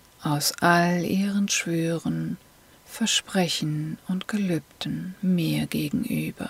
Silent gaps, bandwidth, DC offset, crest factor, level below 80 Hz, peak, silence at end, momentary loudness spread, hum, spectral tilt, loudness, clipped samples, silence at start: none; 16 kHz; under 0.1%; 18 dB; -58 dBFS; -6 dBFS; 0 s; 10 LU; none; -4.5 dB/octave; -25 LUFS; under 0.1%; 0.2 s